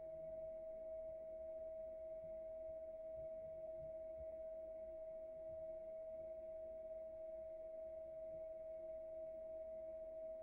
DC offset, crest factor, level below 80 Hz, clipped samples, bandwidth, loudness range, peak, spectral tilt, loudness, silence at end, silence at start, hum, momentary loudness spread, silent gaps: under 0.1%; 8 dB; -72 dBFS; under 0.1%; 2.9 kHz; 1 LU; -44 dBFS; -8.5 dB/octave; -52 LUFS; 0 s; 0 s; none; 1 LU; none